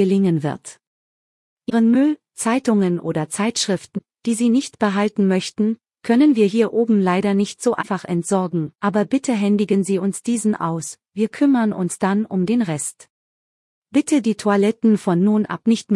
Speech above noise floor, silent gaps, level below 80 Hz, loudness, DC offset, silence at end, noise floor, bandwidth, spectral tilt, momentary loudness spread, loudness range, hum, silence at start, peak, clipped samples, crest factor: over 72 dB; 0.87-1.57 s, 13.10-13.82 s; -66 dBFS; -19 LUFS; under 0.1%; 0 s; under -90 dBFS; 12 kHz; -5.5 dB/octave; 8 LU; 3 LU; none; 0 s; -4 dBFS; under 0.1%; 16 dB